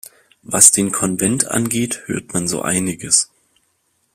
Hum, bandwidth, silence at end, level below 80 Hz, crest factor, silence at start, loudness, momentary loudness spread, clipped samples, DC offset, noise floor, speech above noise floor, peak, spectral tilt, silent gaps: none; 16 kHz; 0.9 s; -52 dBFS; 18 dB; 0.5 s; -15 LUFS; 13 LU; 0.1%; under 0.1%; -65 dBFS; 48 dB; 0 dBFS; -3 dB/octave; none